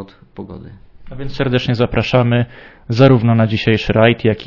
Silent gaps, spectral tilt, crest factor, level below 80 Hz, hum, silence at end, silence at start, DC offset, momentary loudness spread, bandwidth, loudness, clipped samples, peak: none; -8 dB/octave; 16 dB; -36 dBFS; none; 0 s; 0 s; under 0.1%; 22 LU; 6 kHz; -14 LUFS; under 0.1%; 0 dBFS